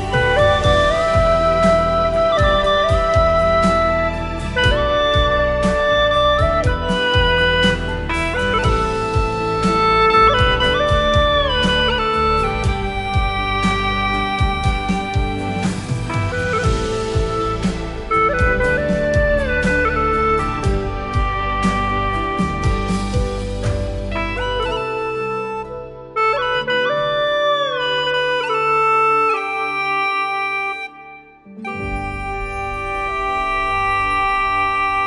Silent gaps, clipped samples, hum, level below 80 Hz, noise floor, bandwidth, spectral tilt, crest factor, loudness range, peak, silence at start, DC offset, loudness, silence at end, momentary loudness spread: none; under 0.1%; none; -26 dBFS; -40 dBFS; 11.5 kHz; -5.5 dB/octave; 16 dB; 6 LU; -2 dBFS; 0 s; under 0.1%; -17 LUFS; 0 s; 8 LU